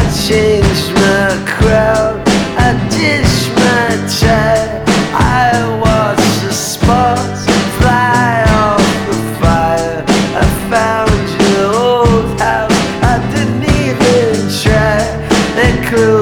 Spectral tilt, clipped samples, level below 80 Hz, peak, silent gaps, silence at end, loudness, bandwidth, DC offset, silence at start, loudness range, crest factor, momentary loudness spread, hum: -5 dB/octave; under 0.1%; -24 dBFS; 0 dBFS; none; 0 s; -11 LUFS; over 20 kHz; under 0.1%; 0 s; 1 LU; 10 dB; 3 LU; none